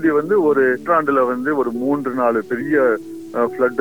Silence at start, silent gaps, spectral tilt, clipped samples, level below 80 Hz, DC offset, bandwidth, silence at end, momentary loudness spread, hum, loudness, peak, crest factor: 0 s; none; -7.5 dB/octave; under 0.1%; -62 dBFS; 0.4%; over 20 kHz; 0 s; 6 LU; none; -18 LUFS; -4 dBFS; 14 dB